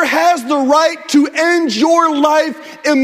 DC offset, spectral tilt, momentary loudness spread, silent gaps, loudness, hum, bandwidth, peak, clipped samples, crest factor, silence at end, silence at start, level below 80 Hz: under 0.1%; -2.5 dB/octave; 4 LU; none; -13 LUFS; none; 16 kHz; 0 dBFS; under 0.1%; 12 dB; 0 s; 0 s; -64 dBFS